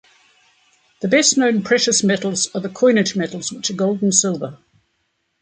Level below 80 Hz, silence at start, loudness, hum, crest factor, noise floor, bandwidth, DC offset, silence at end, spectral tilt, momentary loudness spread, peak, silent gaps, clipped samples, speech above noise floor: -64 dBFS; 1 s; -17 LUFS; none; 18 dB; -69 dBFS; 9.6 kHz; under 0.1%; 0.85 s; -3 dB/octave; 10 LU; -2 dBFS; none; under 0.1%; 52 dB